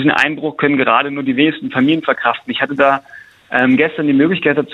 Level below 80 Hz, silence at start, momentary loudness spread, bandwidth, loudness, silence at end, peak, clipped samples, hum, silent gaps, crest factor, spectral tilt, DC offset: -58 dBFS; 0 s; 5 LU; 8 kHz; -14 LUFS; 0 s; 0 dBFS; under 0.1%; none; none; 14 dB; -6.5 dB/octave; under 0.1%